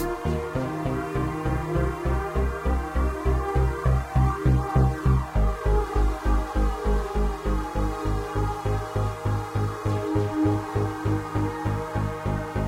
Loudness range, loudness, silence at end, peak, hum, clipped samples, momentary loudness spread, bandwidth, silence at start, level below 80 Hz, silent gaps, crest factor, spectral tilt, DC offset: 3 LU; -26 LUFS; 0 s; -8 dBFS; none; under 0.1%; 5 LU; 15 kHz; 0 s; -28 dBFS; none; 16 dB; -7.5 dB/octave; under 0.1%